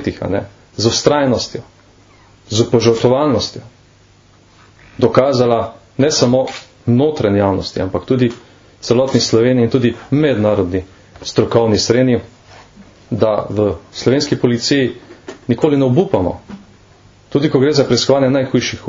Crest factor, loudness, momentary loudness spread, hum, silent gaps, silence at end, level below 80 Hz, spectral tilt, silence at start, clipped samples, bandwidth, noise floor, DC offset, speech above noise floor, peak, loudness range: 16 dB; -15 LUFS; 11 LU; none; none; 0 s; -46 dBFS; -5.5 dB/octave; 0 s; under 0.1%; 7.6 kHz; -48 dBFS; under 0.1%; 34 dB; 0 dBFS; 2 LU